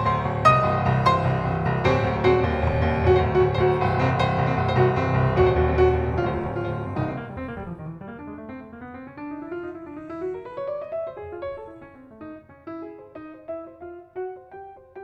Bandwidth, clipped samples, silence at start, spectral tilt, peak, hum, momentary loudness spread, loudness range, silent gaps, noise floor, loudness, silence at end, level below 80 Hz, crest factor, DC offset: 8.8 kHz; under 0.1%; 0 s; -8 dB/octave; -4 dBFS; none; 20 LU; 16 LU; none; -44 dBFS; -22 LUFS; 0 s; -38 dBFS; 20 dB; under 0.1%